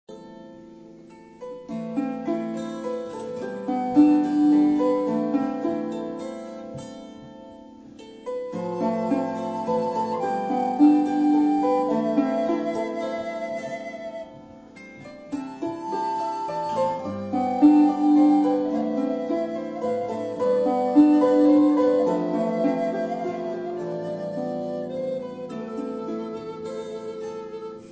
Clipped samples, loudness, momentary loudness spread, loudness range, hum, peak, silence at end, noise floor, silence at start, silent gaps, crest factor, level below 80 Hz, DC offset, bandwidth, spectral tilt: under 0.1%; -24 LUFS; 19 LU; 11 LU; none; -6 dBFS; 0 s; -46 dBFS; 0.1 s; none; 18 dB; -64 dBFS; under 0.1%; 8 kHz; -7.5 dB/octave